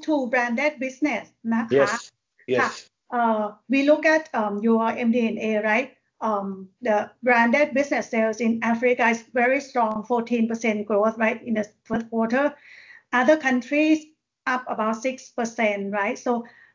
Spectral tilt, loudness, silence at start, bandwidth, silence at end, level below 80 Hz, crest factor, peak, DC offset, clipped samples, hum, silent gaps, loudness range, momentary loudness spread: -5 dB/octave; -23 LUFS; 0 s; 7.6 kHz; 0.25 s; -68 dBFS; 18 dB; -4 dBFS; under 0.1%; under 0.1%; none; none; 3 LU; 9 LU